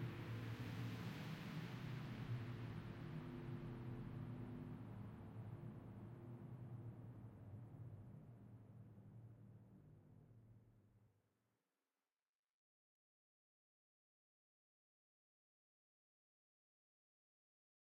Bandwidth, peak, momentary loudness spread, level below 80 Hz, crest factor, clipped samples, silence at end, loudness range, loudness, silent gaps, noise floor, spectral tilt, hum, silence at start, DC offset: 16 kHz; -38 dBFS; 15 LU; -72 dBFS; 18 dB; under 0.1%; 6.9 s; 15 LU; -53 LUFS; none; under -90 dBFS; -7.5 dB/octave; none; 0 s; under 0.1%